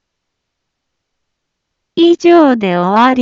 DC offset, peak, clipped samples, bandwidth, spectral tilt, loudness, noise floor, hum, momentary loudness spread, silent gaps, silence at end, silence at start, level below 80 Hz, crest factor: under 0.1%; 0 dBFS; under 0.1%; 7.2 kHz; -6.5 dB/octave; -10 LUFS; -73 dBFS; none; 6 LU; none; 0 s; 1.95 s; -60 dBFS; 12 dB